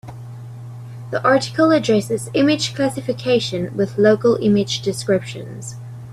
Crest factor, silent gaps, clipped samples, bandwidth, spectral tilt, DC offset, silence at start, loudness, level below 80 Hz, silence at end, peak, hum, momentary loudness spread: 18 dB; none; under 0.1%; 14.5 kHz; -5.5 dB/octave; under 0.1%; 0.05 s; -18 LUFS; -54 dBFS; 0 s; -2 dBFS; none; 19 LU